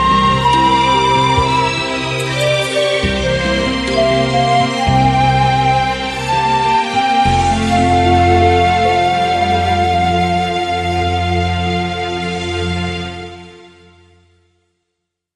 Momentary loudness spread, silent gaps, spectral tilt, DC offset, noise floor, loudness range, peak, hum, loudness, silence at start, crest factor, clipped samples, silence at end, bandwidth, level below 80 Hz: 7 LU; none; -5 dB/octave; under 0.1%; -75 dBFS; 7 LU; 0 dBFS; none; -14 LUFS; 0 s; 14 dB; under 0.1%; 1.75 s; 12 kHz; -30 dBFS